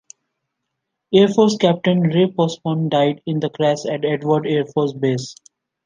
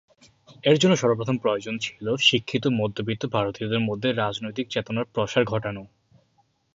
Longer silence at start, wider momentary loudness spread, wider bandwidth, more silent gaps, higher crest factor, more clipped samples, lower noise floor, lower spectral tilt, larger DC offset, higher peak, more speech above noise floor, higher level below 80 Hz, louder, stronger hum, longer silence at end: first, 1.1 s vs 0.5 s; second, 7 LU vs 10 LU; first, 9.6 kHz vs 7.8 kHz; neither; about the same, 16 dB vs 20 dB; neither; first, -78 dBFS vs -67 dBFS; first, -6.5 dB/octave vs -5 dB/octave; neither; about the same, -2 dBFS vs -4 dBFS; first, 60 dB vs 43 dB; about the same, -64 dBFS vs -60 dBFS; first, -18 LUFS vs -24 LUFS; neither; second, 0.5 s vs 0.9 s